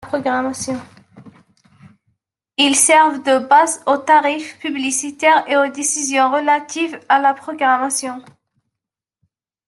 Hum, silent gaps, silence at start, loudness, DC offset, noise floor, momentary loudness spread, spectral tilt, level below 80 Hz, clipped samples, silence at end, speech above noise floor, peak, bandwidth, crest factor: none; none; 0 s; -16 LUFS; under 0.1%; -84 dBFS; 12 LU; -1 dB/octave; -68 dBFS; under 0.1%; 1.45 s; 68 dB; 0 dBFS; 12.5 kHz; 18 dB